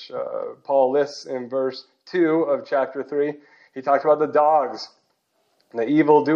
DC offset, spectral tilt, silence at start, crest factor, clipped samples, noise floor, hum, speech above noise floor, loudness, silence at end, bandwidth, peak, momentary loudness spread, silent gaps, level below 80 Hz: under 0.1%; -6.5 dB/octave; 0 s; 18 dB; under 0.1%; -69 dBFS; none; 48 dB; -22 LUFS; 0 s; 7.4 kHz; -2 dBFS; 15 LU; none; -84 dBFS